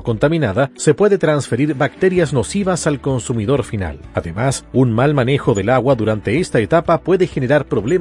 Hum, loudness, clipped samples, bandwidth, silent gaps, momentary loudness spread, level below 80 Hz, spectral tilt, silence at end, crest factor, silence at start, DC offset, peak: none; -16 LUFS; under 0.1%; 11.5 kHz; none; 5 LU; -40 dBFS; -6.5 dB/octave; 0 s; 14 dB; 0 s; under 0.1%; -2 dBFS